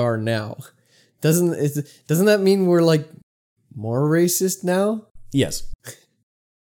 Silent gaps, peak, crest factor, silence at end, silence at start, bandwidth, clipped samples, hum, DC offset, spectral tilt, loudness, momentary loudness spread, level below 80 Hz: 3.23-3.56 s, 5.11-5.15 s, 5.75-5.79 s; -4 dBFS; 16 dB; 0.7 s; 0 s; 18 kHz; under 0.1%; none; under 0.1%; -5.5 dB/octave; -20 LUFS; 18 LU; -46 dBFS